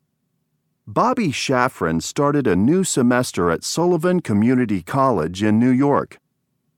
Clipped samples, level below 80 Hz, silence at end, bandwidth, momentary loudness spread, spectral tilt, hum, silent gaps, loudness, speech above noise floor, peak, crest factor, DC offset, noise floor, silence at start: under 0.1%; -52 dBFS; 0.7 s; 16.5 kHz; 4 LU; -5.5 dB/octave; none; none; -19 LUFS; 53 dB; 0 dBFS; 18 dB; under 0.1%; -71 dBFS; 0.85 s